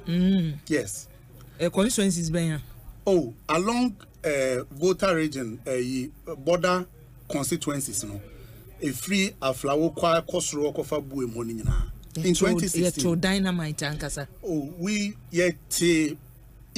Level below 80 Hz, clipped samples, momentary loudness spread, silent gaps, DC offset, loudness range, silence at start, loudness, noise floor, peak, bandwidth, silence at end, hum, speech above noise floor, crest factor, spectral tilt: -42 dBFS; under 0.1%; 10 LU; none; under 0.1%; 2 LU; 0 s; -26 LUFS; -46 dBFS; -12 dBFS; 15.5 kHz; 0.1 s; none; 21 dB; 16 dB; -4.5 dB/octave